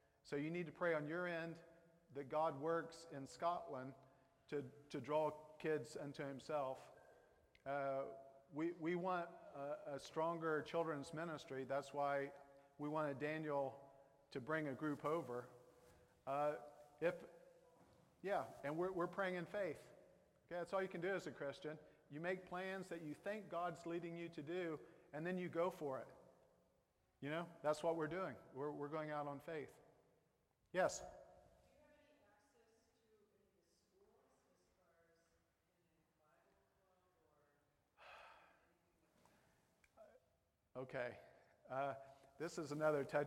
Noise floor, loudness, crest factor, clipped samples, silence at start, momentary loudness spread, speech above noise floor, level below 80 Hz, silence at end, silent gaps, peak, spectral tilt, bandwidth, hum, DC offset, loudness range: -83 dBFS; -46 LUFS; 22 dB; under 0.1%; 0.25 s; 14 LU; 38 dB; -84 dBFS; 0 s; none; -26 dBFS; -6 dB/octave; 16 kHz; none; under 0.1%; 5 LU